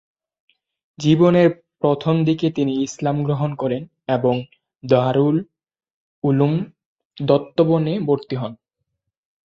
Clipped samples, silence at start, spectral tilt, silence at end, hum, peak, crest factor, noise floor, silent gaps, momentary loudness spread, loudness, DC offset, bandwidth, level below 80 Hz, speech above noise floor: under 0.1%; 1 s; -7.5 dB/octave; 0.9 s; none; -2 dBFS; 18 dB; -77 dBFS; 5.91-6.22 s, 6.86-6.96 s, 7.05-7.10 s; 11 LU; -19 LUFS; under 0.1%; 7.6 kHz; -58 dBFS; 59 dB